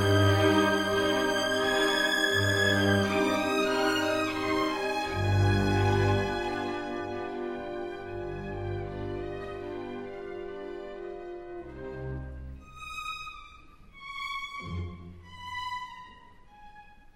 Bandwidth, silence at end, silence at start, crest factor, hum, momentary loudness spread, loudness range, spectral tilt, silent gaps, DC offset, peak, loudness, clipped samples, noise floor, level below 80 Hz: 16 kHz; 0.2 s; 0 s; 20 dB; none; 17 LU; 14 LU; -5 dB/octave; none; under 0.1%; -10 dBFS; -29 LUFS; under 0.1%; -52 dBFS; -48 dBFS